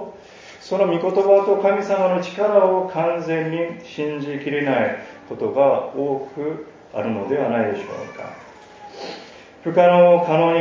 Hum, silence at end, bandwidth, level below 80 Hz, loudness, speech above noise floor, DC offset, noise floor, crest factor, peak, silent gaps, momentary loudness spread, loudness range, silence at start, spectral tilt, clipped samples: none; 0 s; 7.4 kHz; -64 dBFS; -19 LUFS; 23 dB; under 0.1%; -42 dBFS; 18 dB; 0 dBFS; none; 19 LU; 7 LU; 0 s; -7 dB/octave; under 0.1%